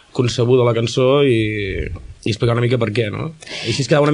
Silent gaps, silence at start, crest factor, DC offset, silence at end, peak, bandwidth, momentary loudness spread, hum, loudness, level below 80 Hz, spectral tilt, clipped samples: none; 0.15 s; 14 dB; under 0.1%; 0 s; -4 dBFS; 10.5 kHz; 12 LU; none; -18 LUFS; -38 dBFS; -6 dB/octave; under 0.1%